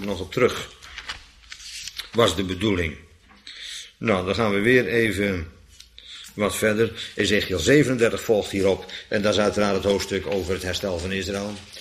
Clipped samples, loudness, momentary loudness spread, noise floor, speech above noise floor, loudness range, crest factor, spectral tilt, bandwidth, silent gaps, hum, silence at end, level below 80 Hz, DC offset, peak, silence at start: under 0.1%; -23 LUFS; 18 LU; -48 dBFS; 25 dB; 5 LU; 20 dB; -4.5 dB/octave; 15.5 kHz; none; none; 0 s; -46 dBFS; under 0.1%; -4 dBFS; 0 s